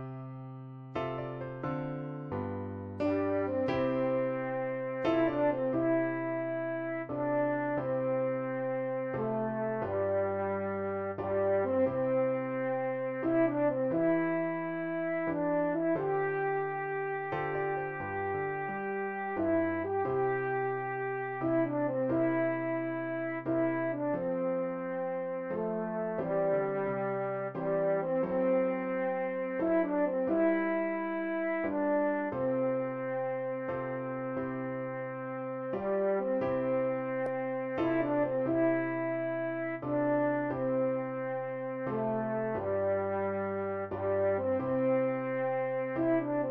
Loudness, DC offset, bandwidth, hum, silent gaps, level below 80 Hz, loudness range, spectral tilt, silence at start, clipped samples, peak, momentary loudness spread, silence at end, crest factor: -32 LUFS; under 0.1%; 5.2 kHz; none; none; -66 dBFS; 3 LU; -10 dB/octave; 0 s; under 0.1%; -18 dBFS; 7 LU; 0 s; 14 dB